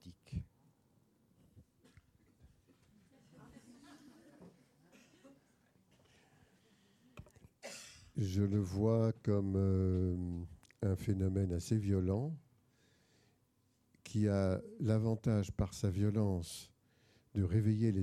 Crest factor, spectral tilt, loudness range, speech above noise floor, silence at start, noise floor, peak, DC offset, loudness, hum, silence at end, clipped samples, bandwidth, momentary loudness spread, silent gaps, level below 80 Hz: 18 dB; -8 dB/octave; 10 LU; 42 dB; 0.05 s; -76 dBFS; -20 dBFS; under 0.1%; -36 LUFS; none; 0 s; under 0.1%; 13.5 kHz; 16 LU; none; -58 dBFS